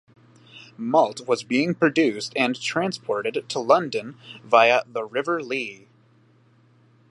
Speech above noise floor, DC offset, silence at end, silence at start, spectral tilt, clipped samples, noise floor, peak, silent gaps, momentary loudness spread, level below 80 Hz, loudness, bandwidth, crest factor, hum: 35 dB; under 0.1%; 1.35 s; 0.55 s; -4.5 dB/octave; under 0.1%; -58 dBFS; -2 dBFS; none; 11 LU; -76 dBFS; -22 LUFS; 11.5 kHz; 22 dB; none